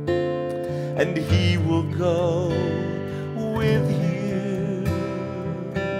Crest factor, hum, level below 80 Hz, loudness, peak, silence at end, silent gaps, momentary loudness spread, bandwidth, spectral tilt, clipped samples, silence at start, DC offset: 18 dB; none; -46 dBFS; -24 LUFS; -6 dBFS; 0 s; none; 8 LU; 15 kHz; -7.5 dB/octave; under 0.1%; 0 s; under 0.1%